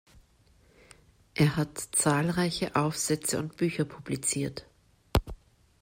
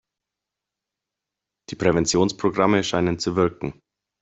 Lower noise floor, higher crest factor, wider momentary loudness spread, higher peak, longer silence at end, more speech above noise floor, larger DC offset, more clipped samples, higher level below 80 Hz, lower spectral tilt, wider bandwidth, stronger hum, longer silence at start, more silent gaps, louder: second, -62 dBFS vs -86 dBFS; about the same, 22 dB vs 22 dB; second, 8 LU vs 12 LU; second, -8 dBFS vs -4 dBFS; about the same, 0.45 s vs 0.5 s; second, 34 dB vs 65 dB; neither; neither; first, -46 dBFS vs -52 dBFS; about the same, -4.5 dB/octave vs -5 dB/octave; first, 16 kHz vs 8.2 kHz; second, none vs 50 Hz at -50 dBFS; second, 1.35 s vs 1.7 s; neither; second, -29 LUFS vs -21 LUFS